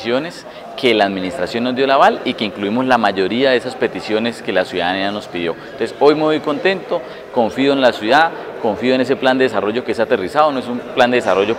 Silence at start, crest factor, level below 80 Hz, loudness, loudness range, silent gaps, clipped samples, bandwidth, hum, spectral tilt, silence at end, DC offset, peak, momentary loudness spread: 0 s; 16 dB; -56 dBFS; -16 LUFS; 2 LU; none; under 0.1%; 15 kHz; none; -5 dB/octave; 0 s; under 0.1%; 0 dBFS; 9 LU